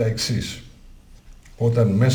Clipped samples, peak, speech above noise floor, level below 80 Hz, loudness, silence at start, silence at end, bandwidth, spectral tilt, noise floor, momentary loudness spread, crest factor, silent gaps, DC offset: under 0.1%; -6 dBFS; 26 dB; -44 dBFS; -22 LUFS; 0 s; 0 s; 17 kHz; -6 dB/octave; -45 dBFS; 14 LU; 16 dB; none; under 0.1%